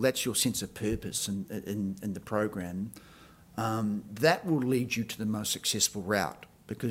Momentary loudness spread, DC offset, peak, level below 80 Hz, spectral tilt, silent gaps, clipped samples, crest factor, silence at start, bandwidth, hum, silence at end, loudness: 11 LU; under 0.1%; -8 dBFS; -58 dBFS; -4 dB/octave; none; under 0.1%; 24 dB; 0 s; 16 kHz; none; 0 s; -31 LUFS